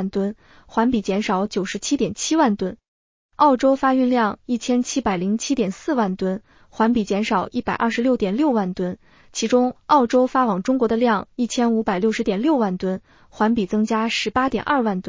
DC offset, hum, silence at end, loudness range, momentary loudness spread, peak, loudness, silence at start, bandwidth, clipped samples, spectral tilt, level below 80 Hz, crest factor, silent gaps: under 0.1%; none; 0 s; 2 LU; 8 LU; -4 dBFS; -21 LUFS; 0 s; 7.6 kHz; under 0.1%; -5 dB/octave; -52 dBFS; 16 dB; 2.88-3.29 s